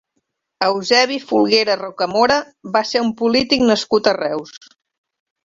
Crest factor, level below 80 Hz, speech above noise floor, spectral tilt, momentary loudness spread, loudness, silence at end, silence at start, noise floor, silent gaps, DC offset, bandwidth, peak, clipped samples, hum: 18 dB; -56 dBFS; 55 dB; -3.5 dB/octave; 6 LU; -17 LUFS; 0.9 s; 0.6 s; -72 dBFS; none; under 0.1%; 7.8 kHz; 0 dBFS; under 0.1%; none